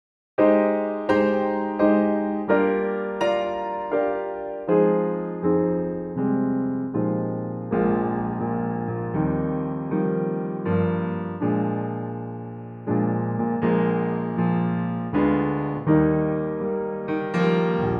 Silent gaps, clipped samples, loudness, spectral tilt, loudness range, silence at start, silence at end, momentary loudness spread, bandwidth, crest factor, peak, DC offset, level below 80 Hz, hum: none; under 0.1%; -24 LUFS; -9.5 dB/octave; 3 LU; 0.4 s; 0 s; 8 LU; 6.2 kHz; 16 dB; -6 dBFS; under 0.1%; -50 dBFS; none